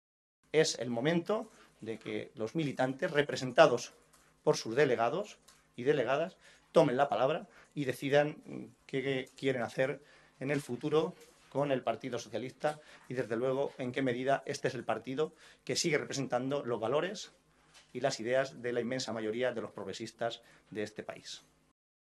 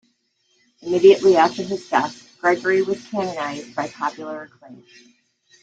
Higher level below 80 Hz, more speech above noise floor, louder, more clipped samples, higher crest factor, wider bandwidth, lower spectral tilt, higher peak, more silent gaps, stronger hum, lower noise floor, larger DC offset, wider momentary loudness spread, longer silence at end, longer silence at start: second, -76 dBFS vs -66 dBFS; second, 30 dB vs 47 dB; second, -34 LUFS vs -19 LUFS; neither; first, 26 dB vs 18 dB; first, 13 kHz vs 7.8 kHz; about the same, -4.5 dB/octave vs -5 dB/octave; second, -8 dBFS vs -2 dBFS; neither; neither; about the same, -63 dBFS vs -66 dBFS; neither; second, 15 LU vs 19 LU; second, 0.75 s vs 0.9 s; second, 0.55 s vs 0.85 s